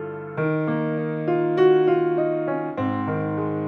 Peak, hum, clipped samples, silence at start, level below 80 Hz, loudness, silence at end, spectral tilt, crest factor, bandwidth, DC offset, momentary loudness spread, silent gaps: -6 dBFS; none; under 0.1%; 0 s; -68 dBFS; -22 LUFS; 0 s; -10 dB/octave; 16 dB; 4.5 kHz; under 0.1%; 8 LU; none